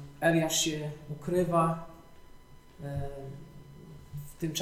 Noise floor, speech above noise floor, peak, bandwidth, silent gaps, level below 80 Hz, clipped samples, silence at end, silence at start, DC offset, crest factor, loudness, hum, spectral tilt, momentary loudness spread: -52 dBFS; 22 dB; -12 dBFS; 15.5 kHz; none; -52 dBFS; under 0.1%; 0 s; 0 s; under 0.1%; 20 dB; -30 LUFS; none; -4 dB/octave; 24 LU